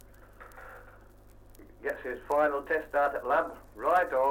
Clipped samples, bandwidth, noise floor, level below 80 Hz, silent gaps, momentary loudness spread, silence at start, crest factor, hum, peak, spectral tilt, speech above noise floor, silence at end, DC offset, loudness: under 0.1%; 16.5 kHz; -54 dBFS; -56 dBFS; none; 22 LU; 0.4 s; 18 dB; 50 Hz at -60 dBFS; -14 dBFS; -5 dB/octave; 25 dB; 0 s; under 0.1%; -30 LUFS